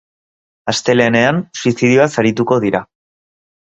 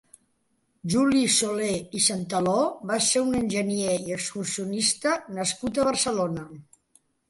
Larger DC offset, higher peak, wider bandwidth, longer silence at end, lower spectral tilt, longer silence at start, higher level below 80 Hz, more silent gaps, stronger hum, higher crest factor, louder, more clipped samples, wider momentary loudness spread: neither; first, 0 dBFS vs -8 dBFS; second, 8.2 kHz vs 12 kHz; first, 0.85 s vs 0.7 s; first, -5 dB/octave vs -3 dB/octave; second, 0.65 s vs 0.85 s; first, -52 dBFS vs -58 dBFS; neither; neither; about the same, 16 dB vs 18 dB; first, -14 LUFS vs -24 LUFS; neither; about the same, 8 LU vs 8 LU